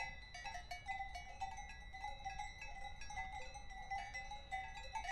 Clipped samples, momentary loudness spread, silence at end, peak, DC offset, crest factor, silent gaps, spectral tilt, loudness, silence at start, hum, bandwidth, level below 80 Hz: under 0.1%; 5 LU; 0 s; -30 dBFS; under 0.1%; 18 dB; none; -2.5 dB/octave; -49 LUFS; 0 s; none; 12.5 kHz; -56 dBFS